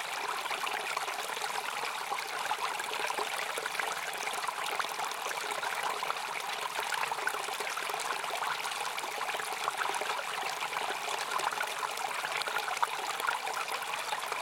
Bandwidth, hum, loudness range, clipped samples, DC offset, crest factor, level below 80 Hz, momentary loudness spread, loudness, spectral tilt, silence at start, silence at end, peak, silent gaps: 17 kHz; none; 1 LU; under 0.1%; under 0.1%; 24 dB; -82 dBFS; 2 LU; -34 LUFS; 0.5 dB/octave; 0 s; 0 s; -12 dBFS; none